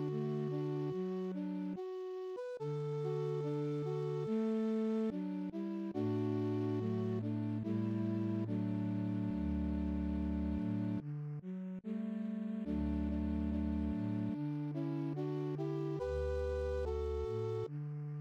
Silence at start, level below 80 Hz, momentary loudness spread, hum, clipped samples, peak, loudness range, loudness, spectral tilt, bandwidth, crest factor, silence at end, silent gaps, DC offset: 0 s; -50 dBFS; 5 LU; none; under 0.1%; -26 dBFS; 2 LU; -39 LUFS; -9.5 dB/octave; 8 kHz; 12 dB; 0 s; none; under 0.1%